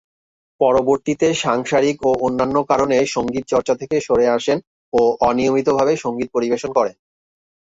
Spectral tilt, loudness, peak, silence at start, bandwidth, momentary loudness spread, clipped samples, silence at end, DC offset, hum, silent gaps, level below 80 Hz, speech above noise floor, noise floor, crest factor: -5 dB/octave; -18 LUFS; -2 dBFS; 0.6 s; 8 kHz; 5 LU; under 0.1%; 0.8 s; under 0.1%; none; 4.67-4.92 s; -50 dBFS; over 73 dB; under -90 dBFS; 16 dB